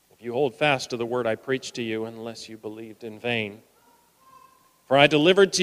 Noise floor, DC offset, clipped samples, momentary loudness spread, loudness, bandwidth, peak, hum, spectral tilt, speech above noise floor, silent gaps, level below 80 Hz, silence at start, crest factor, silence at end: -60 dBFS; under 0.1%; under 0.1%; 20 LU; -23 LUFS; 15 kHz; -2 dBFS; none; -4 dB/octave; 36 dB; none; -68 dBFS; 0.25 s; 24 dB; 0 s